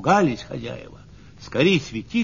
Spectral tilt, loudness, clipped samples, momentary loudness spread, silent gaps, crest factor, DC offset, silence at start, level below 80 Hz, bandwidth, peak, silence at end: -5.5 dB/octave; -22 LUFS; under 0.1%; 17 LU; none; 18 dB; 0.2%; 0 s; -50 dBFS; 7.4 kHz; -4 dBFS; 0 s